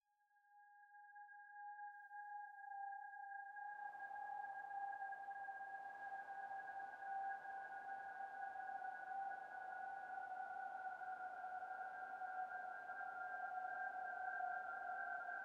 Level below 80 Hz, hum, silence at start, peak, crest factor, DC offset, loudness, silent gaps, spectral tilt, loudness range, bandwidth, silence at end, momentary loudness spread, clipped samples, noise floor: under -90 dBFS; none; 0.35 s; -36 dBFS; 14 dB; under 0.1%; -50 LUFS; none; -3.5 dB/octave; 5 LU; 9 kHz; 0 s; 7 LU; under 0.1%; -79 dBFS